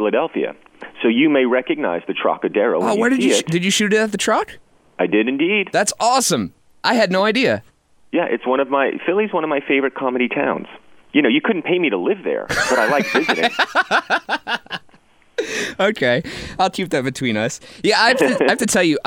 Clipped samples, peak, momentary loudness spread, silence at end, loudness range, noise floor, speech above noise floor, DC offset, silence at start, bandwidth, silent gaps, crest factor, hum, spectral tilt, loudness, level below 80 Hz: under 0.1%; -2 dBFS; 9 LU; 0.05 s; 3 LU; -51 dBFS; 34 dB; under 0.1%; 0 s; 16.5 kHz; none; 18 dB; none; -3.5 dB/octave; -18 LUFS; -54 dBFS